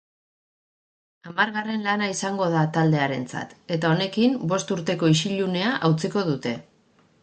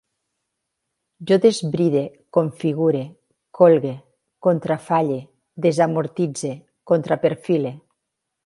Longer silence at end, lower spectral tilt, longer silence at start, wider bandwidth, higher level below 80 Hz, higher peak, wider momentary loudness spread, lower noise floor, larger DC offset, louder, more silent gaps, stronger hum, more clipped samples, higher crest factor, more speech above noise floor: about the same, 0.6 s vs 0.65 s; about the same, -5.5 dB/octave vs -6.5 dB/octave; about the same, 1.25 s vs 1.2 s; second, 9.2 kHz vs 11.5 kHz; about the same, -66 dBFS vs -68 dBFS; second, -6 dBFS vs 0 dBFS; second, 9 LU vs 14 LU; second, -60 dBFS vs -80 dBFS; neither; second, -24 LUFS vs -20 LUFS; neither; neither; neither; about the same, 18 dB vs 20 dB; second, 37 dB vs 61 dB